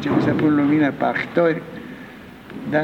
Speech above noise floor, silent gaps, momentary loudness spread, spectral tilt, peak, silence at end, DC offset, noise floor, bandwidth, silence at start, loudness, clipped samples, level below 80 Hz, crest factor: 20 dB; none; 20 LU; -8 dB/octave; -4 dBFS; 0 s; under 0.1%; -39 dBFS; 6.6 kHz; 0 s; -19 LUFS; under 0.1%; -54 dBFS; 16 dB